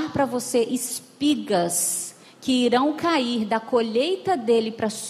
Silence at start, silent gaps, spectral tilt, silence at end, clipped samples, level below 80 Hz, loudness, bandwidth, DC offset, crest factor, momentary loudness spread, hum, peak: 0 s; none; -3.5 dB/octave; 0 s; under 0.1%; -66 dBFS; -23 LUFS; 15 kHz; under 0.1%; 16 dB; 6 LU; none; -8 dBFS